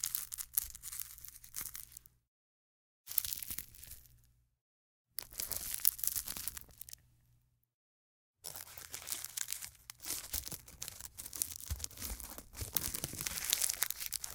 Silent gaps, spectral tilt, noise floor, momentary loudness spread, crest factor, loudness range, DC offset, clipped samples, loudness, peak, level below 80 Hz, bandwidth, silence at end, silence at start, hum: 2.28-3.04 s, 4.61-5.05 s, 7.74-8.34 s; -0.5 dB/octave; -73 dBFS; 18 LU; 42 dB; 6 LU; under 0.1%; under 0.1%; -38 LUFS; -2 dBFS; -58 dBFS; 19 kHz; 0 s; 0 s; 60 Hz at -75 dBFS